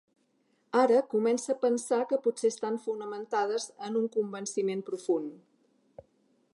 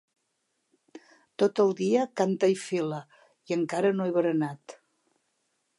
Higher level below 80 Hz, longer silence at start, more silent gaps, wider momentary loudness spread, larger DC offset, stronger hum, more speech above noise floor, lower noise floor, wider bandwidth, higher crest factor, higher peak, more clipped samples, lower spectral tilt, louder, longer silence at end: about the same, -82 dBFS vs -82 dBFS; second, 0.75 s vs 0.95 s; neither; about the same, 9 LU vs 10 LU; neither; neither; second, 43 dB vs 51 dB; second, -72 dBFS vs -77 dBFS; about the same, 11.5 kHz vs 11.5 kHz; about the same, 18 dB vs 18 dB; about the same, -12 dBFS vs -12 dBFS; neither; second, -4.5 dB/octave vs -6 dB/octave; second, -30 LUFS vs -27 LUFS; about the same, 1.15 s vs 1.05 s